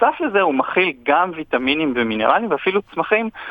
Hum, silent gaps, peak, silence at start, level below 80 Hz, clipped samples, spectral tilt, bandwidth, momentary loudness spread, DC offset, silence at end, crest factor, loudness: none; none; -2 dBFS; 0 s; -56 dBFS; under 0.1%; -7.5 dB/octave; 5 kHz; 4 LU; under 0.1%; 0 s; 18 dB; -18 LUFS